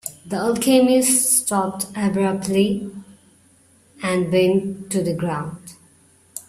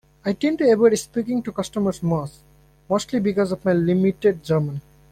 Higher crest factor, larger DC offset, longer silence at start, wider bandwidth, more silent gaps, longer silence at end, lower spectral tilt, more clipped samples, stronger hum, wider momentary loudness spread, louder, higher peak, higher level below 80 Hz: about the same, 18 dB vs 16 dB; neither; second, 0.05 s vs 0.25 s; about the same, 16 kHz vs 15.5 kHz; neither; second, 0.05 s vs 0.3 s; second, -4.5 dB/octave vs -6.5 dB/octave; neither; neither; first, 14 LU vs 9 LU; about the same, -19 LUFS vs -21 LUFS; about the same, -4 dBFS vs -6 dBFS; about the same, -58 dBFS vs -54 dBFS